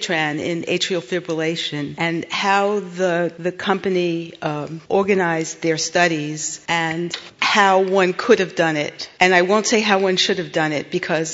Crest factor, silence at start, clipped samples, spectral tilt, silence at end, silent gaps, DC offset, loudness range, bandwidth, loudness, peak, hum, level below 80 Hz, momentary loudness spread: 20 dB; 0 s; under 0.1%; -3.5 dB/octave; 0 s; none; under 0.1%; 4 LU; 8 kHz; -19 LUFS; 0 dBFS; none; -64 dBFS; 9 LU